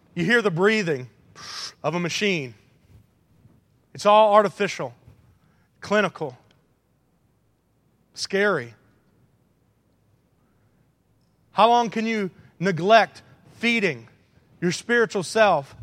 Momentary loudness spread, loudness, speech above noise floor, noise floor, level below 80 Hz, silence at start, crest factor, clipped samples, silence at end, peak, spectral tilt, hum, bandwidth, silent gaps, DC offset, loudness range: 17 LU; -22 LUFS; 45 dB; -66 dBFS; -68 dBFS; 0.15 s; 24 dB; under 0.1%; 0 s; 0 dBFS; -4.5 dB/octave; none; 14 kHz; none; under 0.1%; 8 LU